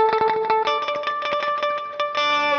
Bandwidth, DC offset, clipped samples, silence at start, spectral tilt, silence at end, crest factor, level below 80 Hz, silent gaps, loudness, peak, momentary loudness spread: 7.2 kHz; under 0.1%; under 0.1%; 0 s; -2.5 dB/octave; 0 s; 16 dB; -62 dBFS; none; -22 LUFS; -6 dBFS; 5 LU